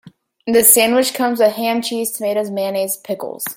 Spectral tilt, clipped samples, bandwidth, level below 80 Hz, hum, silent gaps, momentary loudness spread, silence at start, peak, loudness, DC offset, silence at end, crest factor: -2 dB/octave; under 0.1%; 17 kHz; -62 dBFS; none; none; 14 LU; 0.05 s; 0 dBFS; -15 LUFS; under 0.1%; 0.05 s; 18 dB